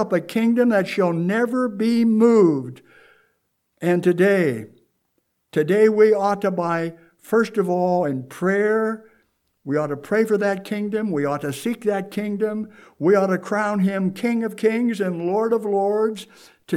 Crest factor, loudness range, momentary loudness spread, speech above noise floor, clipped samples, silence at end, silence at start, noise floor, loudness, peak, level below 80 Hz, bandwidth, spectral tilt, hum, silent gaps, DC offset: 16 dB; 4 LU; 9 LU; 51 dB; under 0.1%; 0 s; 0 s; -71 dBFS; -21 LUFS; -4 dBFS; -74 dBFS; 15 kHz; -7 dB/octave; none; none; under 0.1%